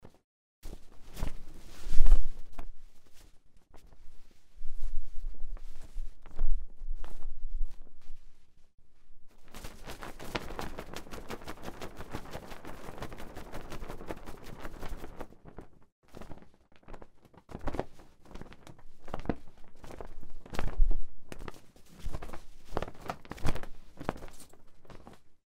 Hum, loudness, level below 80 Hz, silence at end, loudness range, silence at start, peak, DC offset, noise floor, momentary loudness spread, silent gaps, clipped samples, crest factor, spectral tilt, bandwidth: none; -42 LUFS; -34 dBFS; 0.25 s; 10 LU; 0.65 s; -2 dBFS; under 0.1%; -52 dBFS; 20 LU; 15.92-16.03 s; under 0.1%; 24 dB; -5.5 dB/octave; 6 kHz